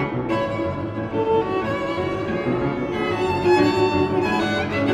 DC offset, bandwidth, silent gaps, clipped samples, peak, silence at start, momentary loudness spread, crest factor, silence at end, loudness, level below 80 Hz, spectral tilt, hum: under 0.1%; 12.5 kHz; none; under 0.1%; -6 dBFS; 0 s; 7 LU; 16 dB; 0 s; -22 LUFS; -46 dBFS; -6.5 dB/octave; none